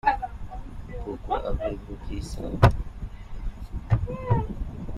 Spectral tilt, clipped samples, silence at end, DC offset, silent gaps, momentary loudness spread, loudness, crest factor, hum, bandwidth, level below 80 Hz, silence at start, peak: -7.5 dB/octave; under 0.1%; 0 s; under 0.1%; none; 19 LU; -28 LUFS; 26 dB; none; 13 kHz; -34 dBFS; 0.05 s; -2 dBFS